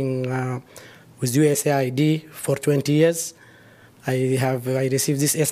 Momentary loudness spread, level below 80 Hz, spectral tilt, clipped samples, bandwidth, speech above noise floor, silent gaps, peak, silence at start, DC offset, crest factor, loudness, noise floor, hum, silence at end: 10 LU; -66 dBFS; -5 dB/octave; under 0.1%; 15.5 kHz; 29 dB; none; -6 dBFS; 0 s; under 0.1%; 16 dB; -22 LUFS; -50 dBFS; none; 0 s